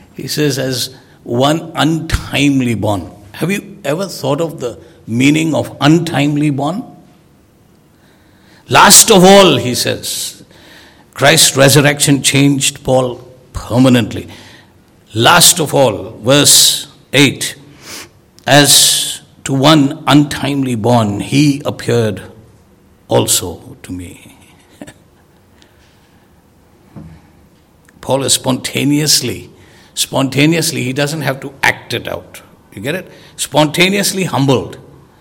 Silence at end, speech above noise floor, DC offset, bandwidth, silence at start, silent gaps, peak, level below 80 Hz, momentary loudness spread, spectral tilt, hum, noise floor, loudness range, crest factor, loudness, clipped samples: 0.4 s; 36 dB; under 0.1%; over 20 kHz; 0.2 s; none; 0 dBFS; -40 dBFS; 19 LU; -3.5 dB/octave; none; -47 dBFS; 9 LU; 14 dB; -11 LUFS; 1%